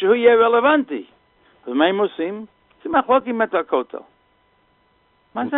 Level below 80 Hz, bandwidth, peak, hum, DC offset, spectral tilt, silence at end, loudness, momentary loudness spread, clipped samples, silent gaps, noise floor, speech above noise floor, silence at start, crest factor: -62 dBFS; 4 kHz; -2 dBFS; none; under 0.1%; -2.5 dB/octave; 0 s; -18 LUFS; 20 LU; under 0.1%; none; -61 dBFS; 43 dB; 0 s; 18 dB